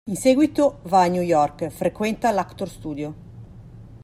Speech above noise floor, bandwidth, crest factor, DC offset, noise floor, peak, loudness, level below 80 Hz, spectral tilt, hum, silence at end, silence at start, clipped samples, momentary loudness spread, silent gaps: 21 dB; 15.5 kHz; 16 dB; under 0.1%; -42 dBFS; -6 dBFS; -21 LUFS; -50 dBFS; -6 dB/octave; none; 0.05 s; 0.05 s; under 0.1%; 14 LU; none